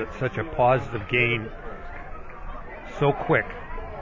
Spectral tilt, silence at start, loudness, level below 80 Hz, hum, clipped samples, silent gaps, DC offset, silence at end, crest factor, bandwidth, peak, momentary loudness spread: -7.5 dB/octave; 0 s; -24 LUFS; -42 dBFS; none; under 0.1%; none; under 0.1%; 0 s; 18 dB; 7.6 kHz; -8 dBFS; 18 LU